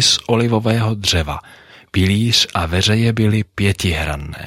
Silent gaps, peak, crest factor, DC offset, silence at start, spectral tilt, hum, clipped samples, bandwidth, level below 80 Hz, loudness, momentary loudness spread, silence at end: none; -2 dBFS; 14 dB; under 0.1%; 0 s; -4.5 dB/octave; none; under 0.1%; 15.5 kHz; -34 dBFS; -16 LUFS; 8 LU; 0 s